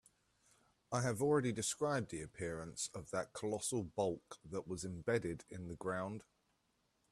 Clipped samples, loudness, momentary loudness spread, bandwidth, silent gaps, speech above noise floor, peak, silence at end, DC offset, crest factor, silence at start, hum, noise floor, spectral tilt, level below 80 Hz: under 0.1%; -41 LUFS; 12 LU; 13.5 kHz; none; 40 dB; -22 dBFS; 0.9 s; under 0.1%; 20 dB; 0.9 s; none; -80 dBFS; -4.5 dB/octave; -70 dBFS